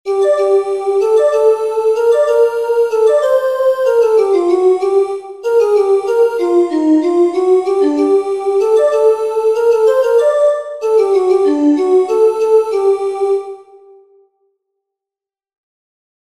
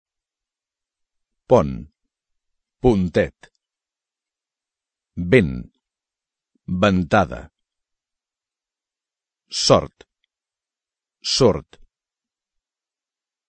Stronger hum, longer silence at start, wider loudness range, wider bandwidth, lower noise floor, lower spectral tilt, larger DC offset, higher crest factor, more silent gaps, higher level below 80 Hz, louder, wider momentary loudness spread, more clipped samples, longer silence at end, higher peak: neither; second, 0.05 s vs 1.5 s; about the same, 4 LU vs 4 LU; first, 12.5 kHz vs 9 kHz; about the same, -88 dBFS vs under -90 dBFS; about the same, -4 dB/octave vs -5 dB/octave; first, 0.2% vs under 0.1%; second, 12 dB vs 24 dB; neither; second, -64 dBFS vs -44 dBFS; first, -13 LUFS vs -19 LUFS; second, 4 LU vs 16 LU; neither; first, 2.7 s vs 1.9 s; about the same, -2 dBFS vs 0 dBFS